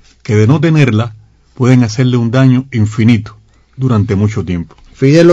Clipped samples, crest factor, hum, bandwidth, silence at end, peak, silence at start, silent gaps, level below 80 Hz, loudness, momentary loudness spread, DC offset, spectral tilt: 1%; 10 dB; none; 7.8 kHz; 0 s; 0 dBFS; 0.3 s; none; -42 dBFS; -11 LUFS; 10 LU; under 0.1%; -7.5 dB/octave